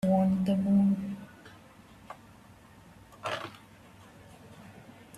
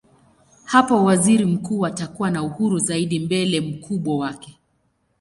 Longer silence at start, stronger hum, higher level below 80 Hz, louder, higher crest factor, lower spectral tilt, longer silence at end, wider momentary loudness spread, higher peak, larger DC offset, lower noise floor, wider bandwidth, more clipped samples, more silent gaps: second, 0.05 s vs 0.65 s; neither; second, -64 dBFS vs -58 dBFS; second, -29 LUFS vs -20 LUFS; about the same, 16 dB vs 20 dB; first, -8 dB/octave vs -5 dB/octave; second, 0 s vs 0.7 s; first, 27 LU vs 10 LU; second, -16 dBFS vs -2 dBFS; neither; second, -55 dBFS vs -67 dBFS; about the same, 12.5 kHz vs 11.5 kHz; neither; neither